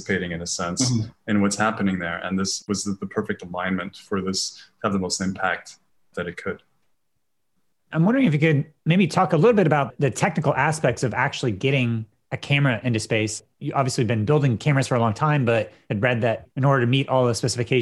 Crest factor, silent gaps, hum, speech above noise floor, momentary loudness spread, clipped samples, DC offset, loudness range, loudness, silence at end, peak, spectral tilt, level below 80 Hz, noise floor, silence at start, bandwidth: 20 dB; none; none; 57 dB; 10 LU; under 0.1%; under 0.1%; 7 LU; -22 LUFS; 0 s; -4 dBFS; -5.5 dB/octave; -60 dBFS; -79 dBFS; 0 s; 12 kHz